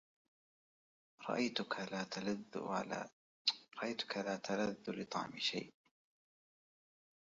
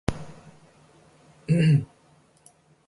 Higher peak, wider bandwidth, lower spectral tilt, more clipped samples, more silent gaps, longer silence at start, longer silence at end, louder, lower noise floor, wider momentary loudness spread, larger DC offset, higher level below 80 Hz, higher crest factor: second, -20 dBFS vs -6 dBFS; second, 7.6 kHz vs 11.5 kHz; second, -2.5 dB/octave vs -8 dB/octave; neither; first, 3.13-3.45 s vs none; first, 1.2 s vs 0.1 s; first, 1.5 s vs 1 s; second, -41 LUFS vs -23 LUFS; first, under -90 dBFS vs -59 dBFS; second, 8 LU vs 23 LU; neither; second, -82 dBFS vs -48 dBFS; about the same, 24 dB vs 22 dB